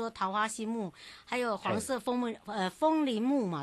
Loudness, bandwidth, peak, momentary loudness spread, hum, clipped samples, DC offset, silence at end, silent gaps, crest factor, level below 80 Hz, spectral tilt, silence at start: -32 LUFS; 12.5 kHz; -16 dBFS; 8 LU; none; under 0.1%; under 0.1%; 0 s; none; 16 dB; -70 dBFS; -4.5 dB/octave; 0 s